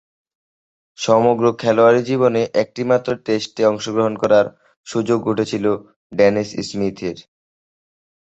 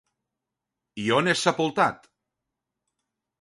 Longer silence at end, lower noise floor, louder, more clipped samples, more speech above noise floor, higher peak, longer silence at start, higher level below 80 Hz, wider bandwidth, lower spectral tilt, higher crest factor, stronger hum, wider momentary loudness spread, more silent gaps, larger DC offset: second, 1.1 s vs 1.45 s; first, under -90 dBFS vs -86 dBFS; first, -18 LUFS vs -24 LUFS; neither; first, over 73 dB vs 62 dB; about the same, -2 dBFS vs -4 dBFS; about the same, 1 s vs 0.95 s; first, -56 dBFS vs -68 dBFS; second, 8.2 kHz vs 11.5 kHz; first, -5.5 dB/octave vs -4 dB/octave; second, 18 dB vs 24 dB; neither; first, 12 LU vs 9 LU; first, 4.77-4.84 s, 5.96-6.10 s vs none; neither